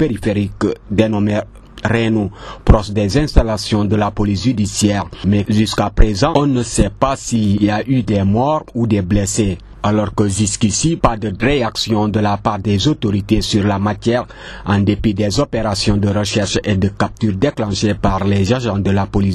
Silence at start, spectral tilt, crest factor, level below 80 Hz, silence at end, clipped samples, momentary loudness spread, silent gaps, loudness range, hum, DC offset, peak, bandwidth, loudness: 0 s; -5.5 dB/octave; 14 dB; -26 dBFS; 0 s; under 0.1%; 4 LU; none; 1 LU; none; under 0.1%; 0 dBFS; 12.5 kHz; -16 LUFS